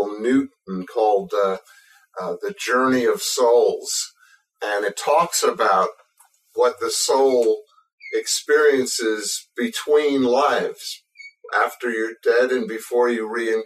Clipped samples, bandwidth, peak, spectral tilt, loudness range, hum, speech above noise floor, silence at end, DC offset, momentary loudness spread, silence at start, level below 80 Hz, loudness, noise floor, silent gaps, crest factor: under 0.1%; 15.5 kHz; -6 dBFS; -2.5 dB/octave; 2 LU; none; 39 dB; 0 s; under 0.1%; 13 LU; 0 s; -74 dBFS; -20 LUFS; -59 dBFS; 7.93-7.98 s; 16 dB